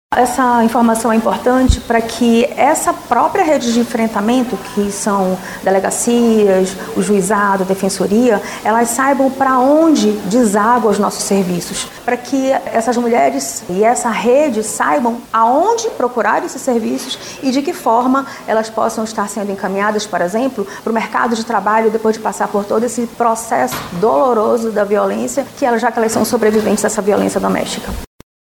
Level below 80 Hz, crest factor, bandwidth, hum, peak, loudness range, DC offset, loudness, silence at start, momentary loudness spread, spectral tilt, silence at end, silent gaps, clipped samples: -36 dBFS; 14 dB; 19.5 kHz; none; 0 dBFS; 4 LU; under 0.1%; -14 LUFS; 0.1 s; 7 LU; -4.5 dB/octave; 0.35 s; none; under 0.1%